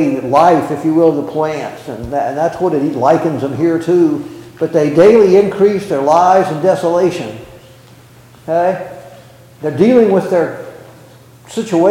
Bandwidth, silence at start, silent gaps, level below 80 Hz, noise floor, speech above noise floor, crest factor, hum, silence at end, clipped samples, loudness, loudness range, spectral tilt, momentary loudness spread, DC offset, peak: 16 kHz; 0 s; none; -50 dBFS; -41 dBFS; 29 dB; 12 dB; none; 0 s; under 0.1%; -13 LUFS; 5 LU; -7 dB/octave; 15 LU; under 0.1%; 0 dBFS